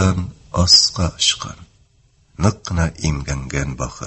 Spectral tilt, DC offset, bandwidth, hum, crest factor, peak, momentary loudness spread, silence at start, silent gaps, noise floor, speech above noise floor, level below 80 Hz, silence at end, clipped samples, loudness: -3.5 dB/octave; under 0.1%; 8.6 kHz; none; 20 dB; 0 dBFS; 15 LU; 0 s; none; -56 dBFS; 38 dB; -30 dBFS; 0 s; under 0.1%; -17 LUFS